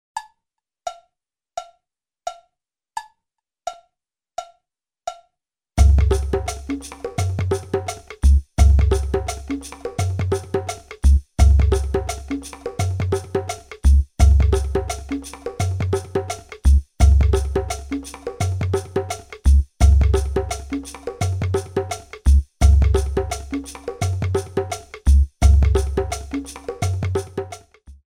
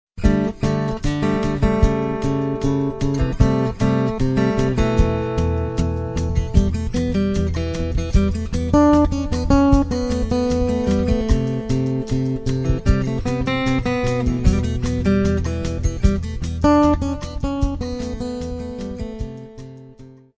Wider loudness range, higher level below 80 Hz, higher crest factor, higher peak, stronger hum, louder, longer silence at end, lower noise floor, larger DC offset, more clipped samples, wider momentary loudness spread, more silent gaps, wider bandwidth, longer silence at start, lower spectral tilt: first, 16 LU vs 3 LU; about the same, -20 dBFS vs -24 dBFS; about the same, 16 dB vs 18 dB; about the same, -2 dBFS vs 0 dBFS; neither; about the same, -21 LUFS vs -20 LUFS; about the same, 0.2 s vs 0.25 s; first, -82 dBFS vs -43 dBFS; neither; neither; first, 18 LU vs 10 LU; neither; first, 12 kHz vs 8 kHz; about the same, 0.15 s vs 0.15 s; about the same, -6.5 dB/octave vs -7.5 dB/octave